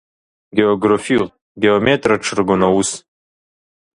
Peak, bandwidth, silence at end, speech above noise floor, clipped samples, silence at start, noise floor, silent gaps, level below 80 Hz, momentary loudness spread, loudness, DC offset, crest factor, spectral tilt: 0 dBFS; 11 kHz; 0.95 s; over 75 dB; under 0.1%; 0.55 s; under -90 dBFS; 1.42-1.55 s; -48 dBFS; 8 LU; -16 LUFS; under 0.1%; 18 dB; -4.5 dB/octave